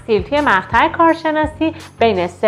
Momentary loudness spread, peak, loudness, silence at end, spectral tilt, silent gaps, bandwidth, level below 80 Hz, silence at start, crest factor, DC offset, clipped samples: 6 LU; 0 dBFS; -15 LUFS; 0 s; -6 dB/octave; none; 11.5 kHz; -38 dBFS; 0.1 s; 16 dB; under 0.1%; under 0.1%